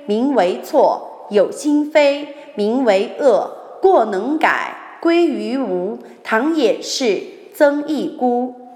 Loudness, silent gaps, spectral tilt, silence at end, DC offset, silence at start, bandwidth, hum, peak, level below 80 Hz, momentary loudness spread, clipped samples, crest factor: -17 LUFS; none; -4.5 dB/octave; 0 s; under 0.1%; 0 s; 16 kHz; none; -2 dBFS; -70 dBFS; 9 LU; under 0.1%; 16 dB